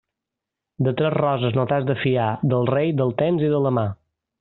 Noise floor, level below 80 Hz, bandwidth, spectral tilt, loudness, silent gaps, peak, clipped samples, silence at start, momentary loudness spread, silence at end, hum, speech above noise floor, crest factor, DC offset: -85 dBFS; -58 dBFS; 4.1 kHz; -6.5 dB/octave; -21 LUFS; none; -6 dBFS; under 0.1%; 0.8 s; 4 LU; 0.45 s; none; 65 dB; 16 dB; under 0.1%